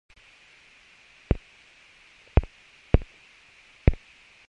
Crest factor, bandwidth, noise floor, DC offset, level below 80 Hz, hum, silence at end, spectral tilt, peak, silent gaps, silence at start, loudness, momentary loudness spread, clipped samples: 28 dB; 7.6 kHz; -55 dBFS; under 0.1%; -32 dBFS; none; 0.55 s; -8.5 dB/octave; 0 dBFS; none; 1.3 s; -28 LUFS; 19 LU; under 0.1%